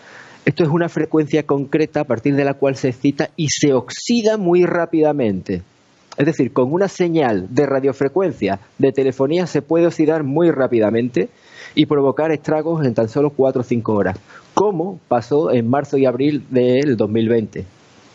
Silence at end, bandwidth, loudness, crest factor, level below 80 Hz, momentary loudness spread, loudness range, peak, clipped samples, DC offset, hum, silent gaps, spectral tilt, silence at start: 0.45 s; 8 kHz; -18 LUFS; 16 dB; -58 dBFS; 5 LU; 1 LU; 0 dBFS; under 0.1%; under 0.1%; none; none; -6.5 dB/octave; 0.1 s